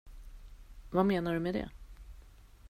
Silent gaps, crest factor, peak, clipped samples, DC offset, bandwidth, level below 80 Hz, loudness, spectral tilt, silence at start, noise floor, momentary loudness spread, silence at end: none; 20 dB; -16 dBFS; under 0.1%; under 0.1%; 15.5 kHz; -50 dBFS; -32 LUFS; -8 dB/octave; 0.05 s; -55 dBFS; 26 LU; 0 s